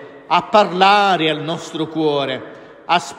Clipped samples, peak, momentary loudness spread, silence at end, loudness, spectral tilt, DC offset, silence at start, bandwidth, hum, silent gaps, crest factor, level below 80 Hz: under 0.1%; 0 dBFS; 13 LU; 0 s; -16 LUFS; -4.5 dB/octave; under 0.1%; 0 s; 12 kHz; none; none; 16 dB; -64 dBFS